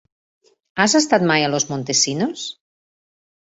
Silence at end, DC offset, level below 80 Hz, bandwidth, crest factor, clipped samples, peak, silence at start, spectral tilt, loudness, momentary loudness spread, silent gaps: 1 s; under 0.1%; -62 dBFS; 8 kHz; 20 dB; under 0.1%; -2 dBFS; 0.75 s; -3 dB/octave; -17 LUFS; 14 LU; none